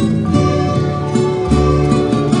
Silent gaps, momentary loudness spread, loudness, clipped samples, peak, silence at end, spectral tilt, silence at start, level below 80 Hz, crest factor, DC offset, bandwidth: none; 3 LU; -15 LUFS; under 0.1%; -2 dBFS; 0 s; -7.5 dB/octave; 0 s; -28 dBFS; 12 dB; under 0.1%; 10.5 kHz